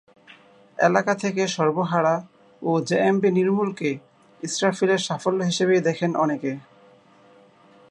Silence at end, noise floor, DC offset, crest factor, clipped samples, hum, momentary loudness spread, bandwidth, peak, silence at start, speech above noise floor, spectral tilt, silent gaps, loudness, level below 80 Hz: 1.3 s; -53 dBFS; under 0.1%; 20 dB; under 0.1%; none; 10 LU; 11 kHz; -4 dBFS; 0.8 s; 32 dB; -5 dB/octave; none; -22 LUFS; -72 dBFS